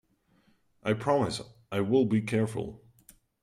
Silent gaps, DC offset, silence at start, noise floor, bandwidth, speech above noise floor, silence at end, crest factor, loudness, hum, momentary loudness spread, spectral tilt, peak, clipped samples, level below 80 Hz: none; under 0.1%; 0.85 s; -67 dBFS; 15 kHz; 40 dB; 0.65 s; 18 dB; -29 LUFS; none; 12 LU; -6.5 dB/octave; -14 dBFS; under 0.1%; -62 dBFS